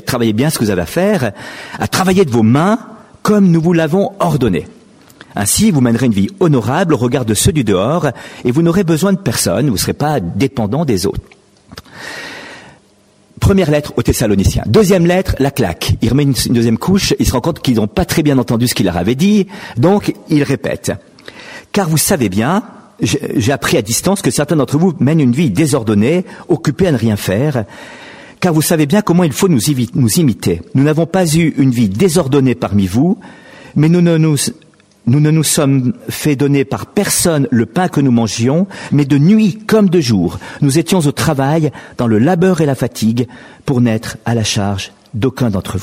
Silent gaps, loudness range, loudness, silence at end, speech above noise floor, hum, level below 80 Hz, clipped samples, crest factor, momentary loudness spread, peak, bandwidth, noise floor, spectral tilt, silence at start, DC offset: none; 3 LU; -13 LUFS; 0 s; 37 dB; none; -36 dBFS; under 0.1%; 12 dB; 9 LU; 0 dBFS; 16 kHz; -50 dBFS; -5.5 dB/octave; 0.05 s; under 0.1%